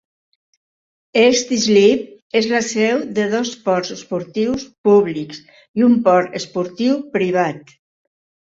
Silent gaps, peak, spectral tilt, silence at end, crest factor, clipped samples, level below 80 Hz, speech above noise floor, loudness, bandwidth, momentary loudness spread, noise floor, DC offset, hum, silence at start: 2.22-2.30 s, 4.78-4.84 s, 5.68-5.74 s; -2 dBFS; -4.5 dB/octave; 0.85 s; 16 dB; under 0.1%; -58 dBFS; over 74 dB; -17 LUFS; 7.8 kHz; 11 LU; under -90 dBFS; under 0.1%; none; 1.15 s